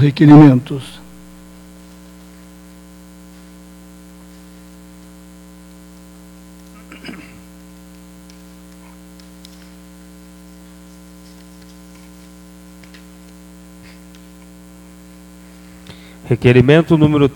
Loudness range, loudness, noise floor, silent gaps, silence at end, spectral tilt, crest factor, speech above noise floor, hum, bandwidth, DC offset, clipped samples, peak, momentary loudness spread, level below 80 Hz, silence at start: 23 LU; -10 LUFS; -40 dBFS; none; 0.05 s; -8 dB/octave; 18 dB; 31 dB; 60 Hz at -40 dBFS; 18 kHz; under 0.1%; under 0.1%; 0 dBFS; 33 LU; -46 dBFS; 0 s